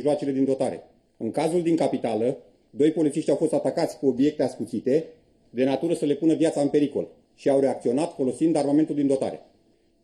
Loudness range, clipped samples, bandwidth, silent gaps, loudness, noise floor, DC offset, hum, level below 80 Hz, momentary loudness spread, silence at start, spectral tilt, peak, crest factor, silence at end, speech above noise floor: 2 LU; under 0.1%; 12 kHz; none; -24 LUFS; -62 dBFS; under 0.1%; none; -68 dBFS; 10 LU; 0 s; -6.5 dB/octave; -10 dBFS; 14 dB; 0.65 s; 39 dB